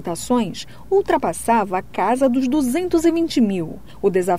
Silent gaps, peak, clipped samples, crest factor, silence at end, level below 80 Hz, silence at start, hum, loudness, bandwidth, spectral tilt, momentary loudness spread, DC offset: none; -6 dBFS; under 0.1%; 12 dB; 0 s; -46 dBFS; 0 s; none; -19 LUFS; 16 kHz; -5.5 dB/octave; 7 LU; 1%